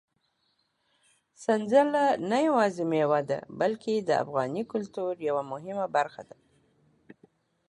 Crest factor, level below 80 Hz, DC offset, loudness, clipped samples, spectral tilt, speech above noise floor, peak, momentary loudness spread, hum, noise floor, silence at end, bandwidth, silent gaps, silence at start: 20 dB; -76 dBFS; under 0.1%; -28 LUFS; under 0.1%; -6 dB/octave; 47 dB; -10 dBFS; 10 LU; none; -74 dBFS; 1.45 s; 11 kHz; none; 1.4 s